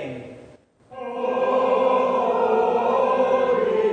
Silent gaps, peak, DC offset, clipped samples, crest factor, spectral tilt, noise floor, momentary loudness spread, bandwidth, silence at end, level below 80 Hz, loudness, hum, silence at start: none; -8 dBFS; under 0.1%; under 0.1%; 14 dB; -6 dB/octave; -50 dBFS; 15 LU; 7.4 kHz; 0 s; -64 dBFS; -20 LUFS; none; 0 s